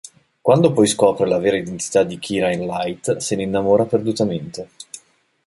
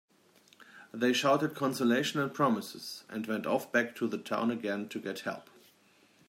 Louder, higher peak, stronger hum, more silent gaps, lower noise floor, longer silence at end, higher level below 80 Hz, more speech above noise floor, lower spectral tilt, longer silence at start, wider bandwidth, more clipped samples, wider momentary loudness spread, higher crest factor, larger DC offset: first, -19 LUFS vs -32 LUFS; first, 0 dBFS vs -14 dBFS; neither; neither; second, -53 dBFS vs -65 dBFS; second, 0.5 s vs 0.85 s; first, -54 dBFS vs -82 dBFS; about the same, 35 dB vs 33 dB; about the same, -5 dB/octave vs -4.5 dB/octave; second, 0.45 s vs 0.6 s; second, 11.5 kHz vs 16 kHz; neither; first, 18 LU vs 12 LU; about the same, 18 dB vs 20 dB; neither